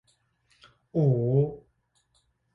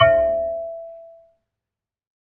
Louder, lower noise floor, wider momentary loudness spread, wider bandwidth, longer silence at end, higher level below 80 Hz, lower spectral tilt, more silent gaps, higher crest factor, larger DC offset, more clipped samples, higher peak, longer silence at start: second, -26 LUFS vs -21 LUFS; second, -71 dBFS vs -88 dBFS; second, 11 LU vs 23 LU; first, 4.6 kHz vs 3.2 kHz; second, 0.95 s vs 1.2 s; second, -60 dBFS vs -50 dBFS; first, -11.5 dB/octave vs -8.5 dB/octave; neither; about the same, 18 dB vs 20 dB; neither; neither; second, -12 dBFS vs -2 dBFS; first, 0.95 s vs 0 s